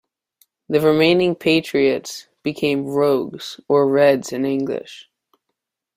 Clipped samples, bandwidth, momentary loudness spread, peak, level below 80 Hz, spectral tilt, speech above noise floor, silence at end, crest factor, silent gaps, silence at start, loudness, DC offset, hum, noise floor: under 0.1%; 16 kHz; 14 LU; -2 dBFS; -60 dBFS; -5.5 dB/octave; 61 dB; 0.95 s; 16 dB; none; 0.7 s; -18 LUFS; under 0.1%; none; -79 dBFS